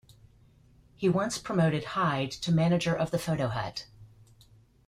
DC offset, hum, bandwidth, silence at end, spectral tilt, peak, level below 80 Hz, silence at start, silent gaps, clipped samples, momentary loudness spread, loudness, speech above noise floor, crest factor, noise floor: under 0.1%; none; 14.5 kHz; 0.8 s; -6 dB/octave; -14 dBFS; -58 dBFS; 1 s; none; under 0.1%; 6 LU; -29 LUFS; 32 dB; 16 dB; -59 dBFS